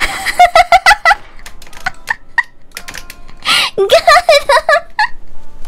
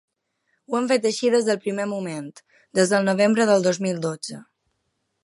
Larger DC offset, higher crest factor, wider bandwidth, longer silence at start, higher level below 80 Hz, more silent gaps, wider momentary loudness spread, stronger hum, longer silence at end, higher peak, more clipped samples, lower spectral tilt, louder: neither; second, 12 dB vs 18 dB; first, 16.5 kHz vs 11.5 kHz; second, 0 s vs 0.7 s; first, -32 dBFS vs -74 dBFS; neither; first, 20 LU vs 15 LU; neither; second, 0 s vs 0.8 s; first, 0 dBFS vs -4 dBFS; neither; second, -1 dB/octave vs -4.5 dB/octave; first, -10 LUFS vs -22 LUFS